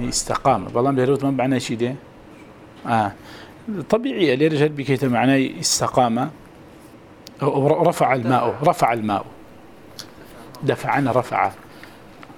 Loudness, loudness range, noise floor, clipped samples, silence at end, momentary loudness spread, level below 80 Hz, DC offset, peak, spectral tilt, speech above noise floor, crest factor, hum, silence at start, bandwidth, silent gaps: -20 LUFS; 4 LU; -44 dBFS; under 0.1%; 0.05 s; 19 LU; -50 dBFS; under 0.1%; -4 dBFS; -5 dB/octave; 25 dB; 18 dB; none; 0 s; over 20 kHz; none